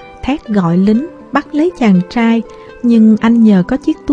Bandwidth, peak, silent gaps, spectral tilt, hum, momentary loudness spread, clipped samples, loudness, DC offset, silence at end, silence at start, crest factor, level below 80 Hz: 7.8 kHz; 0 dBFS; none; -8 dB/octave; none; 10 LU; under 0.1%; -12 LUFS; under 0.1%; 0 s; 0 s; 10 dB; -40 dBFS